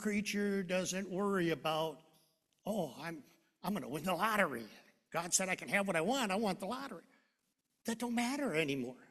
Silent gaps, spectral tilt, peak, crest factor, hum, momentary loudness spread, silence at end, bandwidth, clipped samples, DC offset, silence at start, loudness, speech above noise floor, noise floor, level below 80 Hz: none; -3.5 dB/octave; -14 dBFS; 24 dB; none; 13 LU; 0.05 s; 14 kHz; under 0.1%; under 0.1%; 0 s; -36 LUFS; 47 dB; -83 dBFS; -74 dBFS